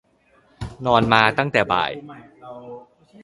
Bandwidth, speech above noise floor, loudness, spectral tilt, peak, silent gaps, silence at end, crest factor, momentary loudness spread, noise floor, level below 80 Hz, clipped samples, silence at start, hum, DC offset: 11.5 kHz; 39 dB; -18 LUFS; -6 dB/octave; 0 dBFS; none; 0.45 s; 22 dB; 23 LU; -58 dBFS; -48 dBFS; under 0.1%; 0.6 s; none; under 0.1%